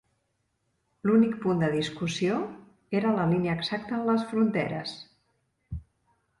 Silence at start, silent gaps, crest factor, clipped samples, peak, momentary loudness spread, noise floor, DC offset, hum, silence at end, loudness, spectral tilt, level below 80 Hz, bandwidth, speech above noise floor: 1.05 s; none; 16 dB; under 0.1%; -12 dBFS; 17 LU; -76 dBFS; under 0.1%; none; 0.6 s; -27 LUFS; -6.5 dB/octave; -56 dBFS; 11.5 kHz; 50 dB